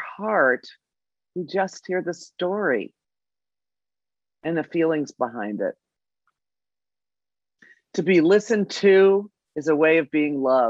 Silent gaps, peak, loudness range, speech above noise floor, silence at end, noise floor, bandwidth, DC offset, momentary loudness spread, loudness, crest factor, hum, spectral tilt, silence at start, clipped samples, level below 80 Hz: none; -6 dBFS; 9 LU; over 69 dB; 0 s; under -90 dBFS; 7.8 kHz; under 0.1%; 13 LU; -22 LUFS; 18 dB; 50 Hz at -65 dBFS; -6 dB/octave; 0 s; under 0.1%; -78 dBFS